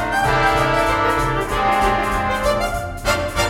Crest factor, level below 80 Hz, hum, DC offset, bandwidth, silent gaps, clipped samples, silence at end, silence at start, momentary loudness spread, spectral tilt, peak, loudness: 14 dB; -30 dBFS; none; under 0.1%; 16.5 kHz; none; under 0.1%; 0 s; 0 s; 5 LU; -4.5 dB/octave; -4 dBFS; -18 LUFS